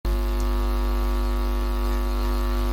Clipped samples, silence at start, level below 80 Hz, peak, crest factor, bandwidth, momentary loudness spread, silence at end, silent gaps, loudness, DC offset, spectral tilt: under 0.1%; 0.05 s; -22 dBFS; -14 dBFS; 8 dB; 16.5 kHz; 1 LU; 0 s; none; -26 LUFS; under 0.1%; -6.5 dB/octave